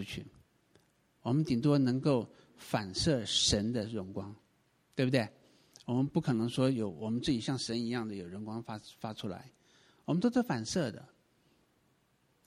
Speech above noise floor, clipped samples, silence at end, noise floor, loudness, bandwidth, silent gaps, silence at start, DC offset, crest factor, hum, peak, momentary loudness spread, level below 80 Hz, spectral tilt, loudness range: 40 dB; under 0.1%; 1.4 s; -73 dBFS; -33 LUFS; 15.5 kHz; none; 0 s; under 0.1%; 22 dB; none; -14 dBFS; 15 LU; -58 dBFS; -5 dB/octave; 6 LU